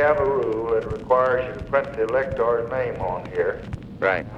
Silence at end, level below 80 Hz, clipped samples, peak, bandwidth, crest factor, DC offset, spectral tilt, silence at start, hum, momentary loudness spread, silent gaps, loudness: 0 s; -44 dBFS; under 0.1%; -6 dBFS; 8.2 kHz; 18 dB; under 0.1%; -7.5 dB/octave; 0 s; none; 7 LU; none; -23 LUFS